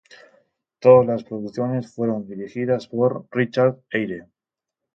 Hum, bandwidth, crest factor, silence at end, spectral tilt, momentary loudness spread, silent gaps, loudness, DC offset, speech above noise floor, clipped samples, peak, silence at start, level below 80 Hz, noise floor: none; 6.6 kHz; 20 dB; 0.75 s; -8.5 dB/octave; 15 LU; none; -21 LUFS; under 0.1%; 67 dB; under 0.1%; -2 dBFS; 0.8 s; -64 dBFS; -87 dBFS